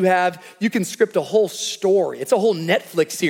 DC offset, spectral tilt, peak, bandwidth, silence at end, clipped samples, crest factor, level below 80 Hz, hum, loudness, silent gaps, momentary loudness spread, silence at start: under 0.1%; -4.5 dB/octave; -4 dBFS; 17 kHz; 0 s; under 0.1%; 16 dB; -72 dBFS; none; -20 LUFS; none; 4 LU; 0 s